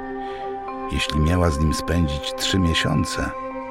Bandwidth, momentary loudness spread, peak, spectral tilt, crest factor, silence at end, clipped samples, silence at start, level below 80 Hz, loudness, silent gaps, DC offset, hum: 16 kHz; 11 LU; -6 dBFS; -5 dB/octave; 16 dB; 0 s; under 0.1%; 0 s; -32 dBFS; -22 LUFS; none; under 0.1%; none